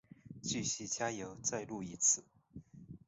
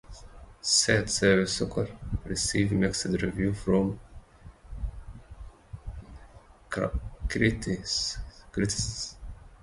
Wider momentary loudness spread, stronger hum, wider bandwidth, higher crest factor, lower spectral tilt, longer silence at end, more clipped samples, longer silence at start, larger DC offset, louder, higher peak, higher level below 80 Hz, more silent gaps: about the same, 25 LU vs 23 LU; neither; second, 8 kHz vs 11.5 kHz; about the same, 22 dB vs 24 dB; about the same, -4 dB/octave vs -4 dB/octave; about the same, 0.1 s vs 0.05 s; neither; first, 0.25 s vs 0.05 s; neither; second, -36 LUFS vs -28 LUFS; second, -18 dBFS vs -6 dBFS; second, -70 dBFS vs -42 dBFS; neither